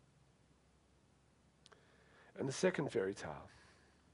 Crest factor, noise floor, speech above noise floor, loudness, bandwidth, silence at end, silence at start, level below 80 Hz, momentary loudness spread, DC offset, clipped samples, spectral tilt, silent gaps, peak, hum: 24 dB; -71 dBFS; 32 dB; -40 LUFS; 11 kHz; 0.65 s; 2.35 s; -74 dBFS; 20 LU; under 0.1%; under 0.1%; -5 dB/octave; none; -20 dBFS; none